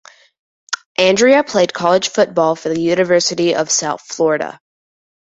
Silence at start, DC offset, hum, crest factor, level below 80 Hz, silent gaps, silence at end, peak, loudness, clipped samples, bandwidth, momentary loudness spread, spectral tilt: 0.7 s; under 0.1%; none; 16 dB; -60 dBFS; 0.86-0.95 s; 0.7 s; 0 dBFS; -15 LUFS; under 0.1%; 8.2 kHz; 10 LU; -3 dB/octave